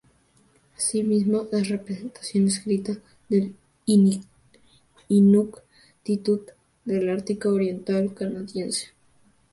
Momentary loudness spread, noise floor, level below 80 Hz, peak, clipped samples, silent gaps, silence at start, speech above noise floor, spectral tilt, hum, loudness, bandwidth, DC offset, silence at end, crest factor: 14 LU; -61 dBFS; -64 dBFS; -8 dBFS; under 0.1%; none; 0.8 s; 38 dB; -6 dB/octave; none; -24 LUFS; 11.5 kHz; under 0.1%; 0.65 s; 16 dB